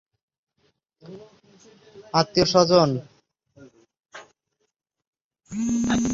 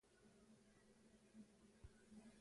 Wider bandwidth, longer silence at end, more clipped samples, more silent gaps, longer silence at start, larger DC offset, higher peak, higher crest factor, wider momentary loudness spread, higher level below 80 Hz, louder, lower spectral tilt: second, 7.8 kHz vs 11 kHz; about the same, 0 s vs 0 s; neither; first, 5.07-5.13 s, 5.24-5.31 s vs none; first, 1.1 s vs 0.05 s; neither; first, -4 dBFS vs -50 dBFS; about the same, 22 dB vs 18 dB; first, 28 LU vs 3 LU; first, -54 dBFS vs -76 dBFS; first, -21 LUFS vs -68 LUFS; about the same, -5 dB/octave vs -5 dB/octave